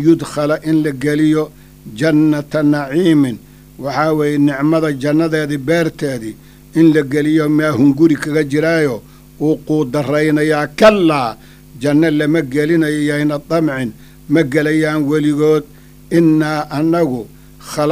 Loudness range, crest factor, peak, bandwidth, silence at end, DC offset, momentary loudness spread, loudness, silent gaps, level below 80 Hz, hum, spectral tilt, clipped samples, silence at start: 2 LU; 14 dB; 0 dBFS; 15.5 kHz; 0 s; under 0.1%; 10 LU; -14 LUFS; none; -46 dBFS; none; -6.5 dB/octave; under 0.1%; 0 s